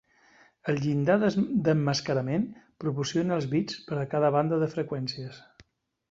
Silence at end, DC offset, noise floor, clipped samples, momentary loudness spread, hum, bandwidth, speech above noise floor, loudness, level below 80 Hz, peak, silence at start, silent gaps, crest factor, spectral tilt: 0.5 s; under 0.1%; -64 dBFS; under 0.1%; 10 LU; none; 7.8 kHz; 37 dB; -28 LUFS; -64 dBFS; -10 dBFS; 0.65 s; none; 18 dB; -6.5 dB/octave